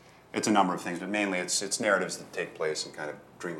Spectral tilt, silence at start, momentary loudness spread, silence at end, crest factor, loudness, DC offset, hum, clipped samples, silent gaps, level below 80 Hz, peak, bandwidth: -3 dB/octave; 0.05 s; 11 LU; 0 s; 20 dB; -29 LUFS; under 0.1%; none; under 0.1%; none; -74 dBFS; -10 dBFS; 16 kHz